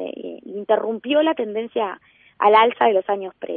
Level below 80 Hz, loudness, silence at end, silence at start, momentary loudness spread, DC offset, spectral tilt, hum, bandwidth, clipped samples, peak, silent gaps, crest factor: -68 dBFS; -19 LUFS; 0 s; 0 s; 18 LU; under 0.1%; -9 dB/octave; none; 4.6 kHz; under 0.1%; -4 dBFS; none; 18 dB